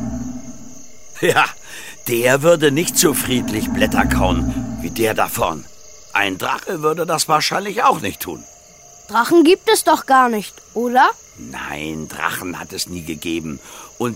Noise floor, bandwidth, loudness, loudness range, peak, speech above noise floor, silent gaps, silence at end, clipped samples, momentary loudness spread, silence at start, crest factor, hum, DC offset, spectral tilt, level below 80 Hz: -44 dBFS; 16.5 kHz; -17 LUFS; 4 LU; 0 dBFS; 26 dB; none; 0 s; under 0.1%; 17 LU; 0 s; 18 dB; none; under 0.1%; -3.5 dB/octave; -36 dBFS